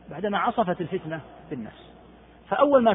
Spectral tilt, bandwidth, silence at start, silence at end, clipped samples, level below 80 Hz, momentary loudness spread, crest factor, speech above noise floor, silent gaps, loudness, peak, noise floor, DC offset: -10 dB/octave; 3.9 kHz; 0.1 s; 0 s; under 0.1%; -58 dBFS; 17 LU; 20 dB; 26 dB; none; -26 LUFS; -6 dBFS; -51 dBFS; under 0.1%